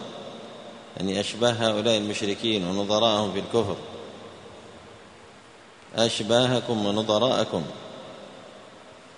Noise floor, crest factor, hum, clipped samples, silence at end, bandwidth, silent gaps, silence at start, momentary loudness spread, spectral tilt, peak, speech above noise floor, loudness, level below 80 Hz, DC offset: -49 dBFS; 22 dB; none; under 0.1%; 0 s; 10.5 kHz; none; 0 s; 23 LU; -4.5 dB/octave; -6 dBFS; 25 dB; -24 LUFS; -62 dBFS; under 0.1%